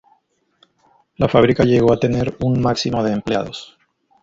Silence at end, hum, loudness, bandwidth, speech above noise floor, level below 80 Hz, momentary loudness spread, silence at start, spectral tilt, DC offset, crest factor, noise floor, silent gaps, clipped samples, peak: 0.6 s; none; -17 LUFS; 7.8 kHz; 45 dB; -42 dBFS; 9 LU; 1.2 s; -7 dB/octave; under 0.1%; 18 dB; -61 dBFS; none; under 0.1%; 0 dBFS